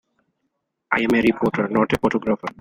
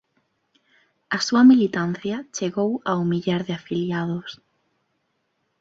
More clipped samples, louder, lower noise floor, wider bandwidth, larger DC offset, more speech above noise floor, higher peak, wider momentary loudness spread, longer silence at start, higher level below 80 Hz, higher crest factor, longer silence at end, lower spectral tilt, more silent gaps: neither; about the same, -20 LUFS vs -22 LUFS; about the same, -75 dBFS vs -72 dBFS; first, 16 kHz vs 7.8 kHz; neither; about the same, 55 dB vs 52 dB; about the same, -4 dBFS vs -6 dBFS; second, 6 LU vs 14 LU; second, 0.9 s vs 1.1 s; first, -50 dBFS vs -64 dBFS; about the same, 18 dB vs 18 dB; second, 0.1 s vs 1.25 s; about the same, -6.5 dB/octave vs -5.5 dB/octave; neither